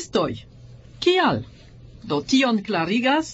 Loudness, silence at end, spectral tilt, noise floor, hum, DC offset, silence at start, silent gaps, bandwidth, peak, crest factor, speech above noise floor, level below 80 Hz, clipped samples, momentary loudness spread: -21 LUFS; 0 s; -4.5 dB/octave; -44 dBFS; none; under 0.1%; 0 s; none; 8.2 kHz; -6 dBFS; 16 dB; 23 dB; -52 dBFS; under 0.1%; 15 LU